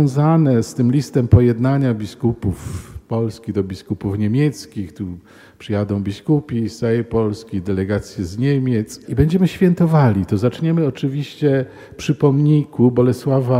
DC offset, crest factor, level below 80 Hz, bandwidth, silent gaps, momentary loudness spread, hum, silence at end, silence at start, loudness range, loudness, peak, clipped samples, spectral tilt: under 0.1%; 18 dB; -42 dBFS; 14 kHz; none; 13 LU; none; 0 s; 0 s; 5 LU; -18 LUFS; 0 dBFS; under 0.1%; -8 dB/octave